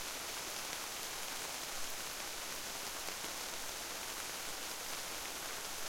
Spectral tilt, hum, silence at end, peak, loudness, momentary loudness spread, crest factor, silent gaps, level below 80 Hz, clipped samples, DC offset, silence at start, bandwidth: 0 dB/octave; none; 0 s; -24 dBFS; -41 LUFS; 1 LU; 18 dB; none; -64 dBFS; under 0.1%; under 0.1%; 0 s; 16.5 kHz